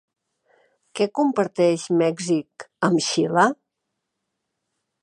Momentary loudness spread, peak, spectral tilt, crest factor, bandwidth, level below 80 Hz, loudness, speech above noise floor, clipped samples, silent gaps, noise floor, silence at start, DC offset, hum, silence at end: 8 LU; -4 dBFS; -5 dB/octave; 20 dB; 11 kHz; -74 dBFS; -21 LUFS; 59 dB; under 0.1%; none; -80 dBFS; 0.95 s; under 0.1%; none; 1.5 s